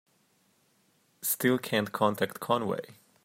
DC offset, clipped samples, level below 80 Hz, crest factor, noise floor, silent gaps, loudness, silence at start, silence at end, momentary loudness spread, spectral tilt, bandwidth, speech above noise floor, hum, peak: under 0.1%; under 0.1%; -78 dBFS; 20 dB; -69 dBFS; none; -29 LUFS; 1.2 s; 0.35 s; 9 LU; -4 dB/octave; 16 kHz; 40 dB; none; -10 dBFS